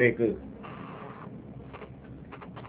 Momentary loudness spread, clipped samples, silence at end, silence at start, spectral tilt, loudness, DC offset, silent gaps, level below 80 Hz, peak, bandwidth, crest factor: 16 LU; under 0.1%; 0 s; 0 s; -6.5 dB/octave; -35 LUFS; under 0.1%; none; -56 dBFS; -10 dBFS; 4 kHz; 22 dB